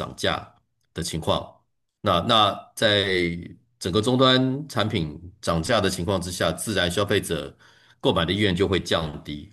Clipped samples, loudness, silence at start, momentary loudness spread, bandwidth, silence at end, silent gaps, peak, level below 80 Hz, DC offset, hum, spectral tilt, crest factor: under 0.1%; -23 LUFS; 0 s; 13 LU; 12.5 kHz; 0.05 s; none; -6 dBFS; -52 dBFS; under 0.1%; none; -4.5 dB/octave; 20 dB